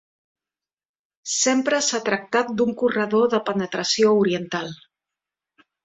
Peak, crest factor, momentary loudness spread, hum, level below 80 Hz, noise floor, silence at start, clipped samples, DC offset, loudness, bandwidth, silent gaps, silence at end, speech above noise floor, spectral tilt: -6 dBFS; 18 dB; 9 LU; none; -66 dBFS; under -90 dBFS; 1.25 s; under 0.1%; under 0.1%; -21 LUFS; 8.4 kHz; none; 1.1 s; over 69 dB; -3 dB/octave